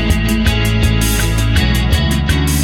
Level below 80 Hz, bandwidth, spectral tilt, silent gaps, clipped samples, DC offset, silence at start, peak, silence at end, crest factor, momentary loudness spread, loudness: -18 dBFS; 18.5 kHz; -4.5 dB/octave; none; under 0.1%; under 0.1%; 0 s; -2 dBFS; 0 s; 10 dB; 1 LU; -14 LUFS